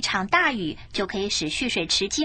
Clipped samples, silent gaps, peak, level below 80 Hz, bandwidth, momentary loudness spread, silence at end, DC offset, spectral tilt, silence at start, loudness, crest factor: under 0.1%; none; -6 dBFS; -48 dBFS; 10 kHz; 9 LU; 0 s; under 0.1%; -2.5 dB/octave; 0 s; -24 LUFS; 18 dB